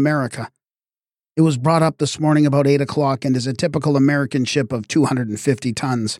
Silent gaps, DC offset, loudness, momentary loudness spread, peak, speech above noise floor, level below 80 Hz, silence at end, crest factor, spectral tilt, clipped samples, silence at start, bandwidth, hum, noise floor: none; under 0.1%; -18 LUFS; 6 LU; -4 dBFS; over 72 dB; -58 dBFS; 0.05 s; 16 dB; -6 dB/octave; under 0.1%; 0 s; 13.5 kHz; none; under -90 dBFS